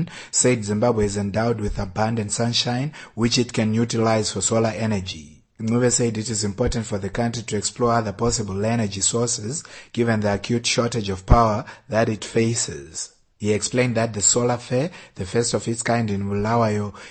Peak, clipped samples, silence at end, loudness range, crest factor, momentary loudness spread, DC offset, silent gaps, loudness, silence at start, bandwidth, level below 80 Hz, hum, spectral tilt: -2 dBFS; under 0.1%; 0 s; 1 LU; 20 dB; 9 LU; under 0.1%; none; -22 LUFS; 0 s; 9.4 kHz; -36 dBFS; none; -4.5 dB/octave